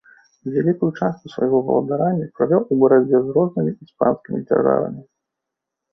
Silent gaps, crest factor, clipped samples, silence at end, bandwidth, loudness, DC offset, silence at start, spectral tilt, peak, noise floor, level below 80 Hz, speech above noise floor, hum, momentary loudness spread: none; 16 dB; under 0.1%; 0.9 s; 6 kHz; -19 LUFS; under 0.1%; 0.45 s; -10.5 dB/octave; -2 dBFS; -83 dBFS; -60 dBFS; 64 dB; none; 10 LU